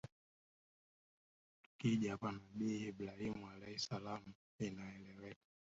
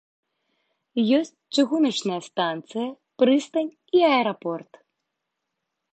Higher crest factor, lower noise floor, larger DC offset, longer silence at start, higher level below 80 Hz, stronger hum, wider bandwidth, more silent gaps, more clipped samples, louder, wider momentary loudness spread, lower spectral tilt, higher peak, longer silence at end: about the same, 20 dB vs 18 dB; first, under -90 dBFS vs -81 dBFS; neither; second, 0.05 s vs 0.95 s; about the same, -74 dBFS vs -78 dBFS; neither; second, 7.6 kHz vs 9 kHz; first, 0.12-1.79 s, 4.35-4.59 s vs none; neither; second, -45 LUFS vs -23 LUFS; first, 16 LU vs 11 LU; about the same, -5.5 dB/octave vs -4.5 dB/octave; second, -26 dBFS vs -6 dBFS; second, 0.45 s vs 1.3 s